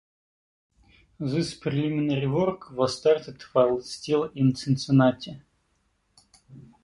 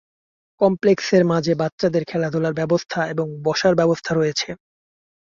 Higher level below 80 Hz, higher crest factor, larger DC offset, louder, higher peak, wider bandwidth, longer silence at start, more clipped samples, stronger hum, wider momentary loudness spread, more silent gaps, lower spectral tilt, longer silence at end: about the same, -60 dBFS vs -58 dBFS; about the same, 18 dB vs 16 dB; neither; second, -25 LUFS vs -20 LUFS; second, -8 dBFS vs -4 dBFS; first, 11.5 kHz vs 7.4 kHz; first, 1.2 s vs 0.6 s; neither; neither; about the same, 8 LU vs 7 LU; second, none vs 1.72-1.78 s; first, -7 dB/octave vs -5.5 dB/octave; second, 0.2 s vs 0.75 s